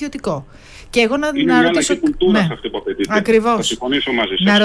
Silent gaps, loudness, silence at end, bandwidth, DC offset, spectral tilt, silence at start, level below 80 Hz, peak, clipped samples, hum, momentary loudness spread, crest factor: none; -16 LUFS; 0 s; 11 kHz; under 0.1%; -4 dB/octave; 0 s; -42 dBFS; -2 dBFS; under 0.1%; none; 10 LU; 14 dB